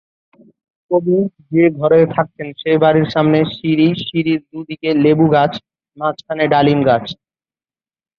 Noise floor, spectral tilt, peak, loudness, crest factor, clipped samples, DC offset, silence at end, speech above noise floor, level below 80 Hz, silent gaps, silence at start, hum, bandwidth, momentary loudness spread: under -90 dBFS; -9 dB/octave; -2 dBFS; -15 LUFS; 14 dB; under 0.1%; under 0.1%; 1.05 s; over 76 dB; -54 dBFS; none; 0.9 s; none; 6.2 kHz; 10 LU